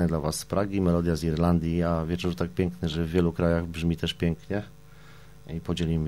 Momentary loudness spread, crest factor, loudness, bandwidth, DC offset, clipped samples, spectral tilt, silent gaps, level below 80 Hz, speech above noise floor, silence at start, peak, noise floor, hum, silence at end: 8 LU; 18 dB; -27 LUFS; 13.5 kHz; 0.3%; under 0.1%; -6.5 dB/octave; none; -42 dBFS; 24 dB; 0 s; -8 dBFS; -50 dBFS; none; 0 s